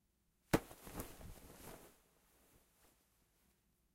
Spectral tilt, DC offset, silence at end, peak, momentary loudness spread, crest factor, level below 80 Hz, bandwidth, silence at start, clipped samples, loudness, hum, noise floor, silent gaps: -5 dB/octave; under 0.1%; 2 s; -18 dBFS; 19 LU; 32 dB; -62 dBFS; 16 kHz; 0.5 s; under 0.1%; -43 LUFS; none; -79 dBFS; none